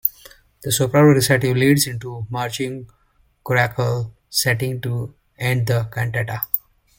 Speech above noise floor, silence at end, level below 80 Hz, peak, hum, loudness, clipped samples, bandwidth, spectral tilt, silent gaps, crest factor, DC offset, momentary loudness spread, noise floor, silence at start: 29 dB; 0.4 s; -50 dBFS; 0 dBFS; none; -20 LUFS; under 0.1%; 17 kHz; -5 dB/octave; none; 20 dB; under 0.1%; 14 LU; -48 dBFS; 0.05 s